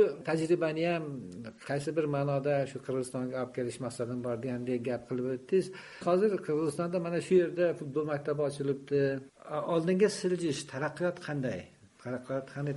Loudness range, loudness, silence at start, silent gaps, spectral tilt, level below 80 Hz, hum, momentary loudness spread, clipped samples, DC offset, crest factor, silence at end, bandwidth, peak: 4 LU; -32 LUFS; 0 s; none; -6.5 dB/octave; -70 dBFS; none; 9 LU; under 0.1%; under 0.1%; 18 dB; 0 s; 11.5 kHz; -14 dBFS